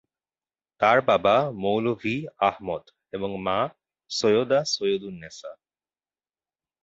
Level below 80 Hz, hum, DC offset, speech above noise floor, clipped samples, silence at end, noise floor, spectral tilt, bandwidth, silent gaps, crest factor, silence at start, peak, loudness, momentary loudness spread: -62 dBFS; none; under 0.1%; over 66 dB; under 0.1%; 1.3 s; under -90 dBFS; -4.5 dB/octave; 8 kHz; none; 20 dB; 0.8 s; -6 dBFS; -24 LUFS; 18 LU